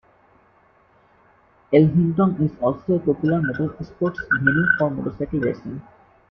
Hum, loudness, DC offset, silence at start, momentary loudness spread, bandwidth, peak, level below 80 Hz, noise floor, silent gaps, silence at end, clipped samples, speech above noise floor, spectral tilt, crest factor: none; -21 LUFS; under 0.1%; 1.7 s; 10 LU; 5.6 kHz; -2 dBFS; -50 dBFS; -57 dBFS; none; 0.5 s; under 0.1%; 37 dB; -10.5 dB/octave; 20 dB